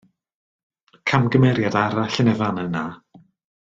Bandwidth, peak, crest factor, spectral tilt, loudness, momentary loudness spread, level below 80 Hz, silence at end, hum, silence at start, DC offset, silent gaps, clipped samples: 7.6 kHz; -2 dBFS; 20 dB; -7 dB/octave; -20 LUFS; 10 LU; -56 dBFS; 0.75 s; none; 1.05 s; under 0.1%; none; under 0.1%